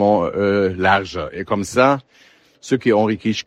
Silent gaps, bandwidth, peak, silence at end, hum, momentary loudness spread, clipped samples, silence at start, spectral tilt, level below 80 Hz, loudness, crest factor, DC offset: none; 13 kHz; 0 dBFS; 0.05 s; none; 8 LU; under 0.1%; 0 s; -5.5 dB/octave; -50 dBFS; -18 LUFS; 18 dB; under 0.1%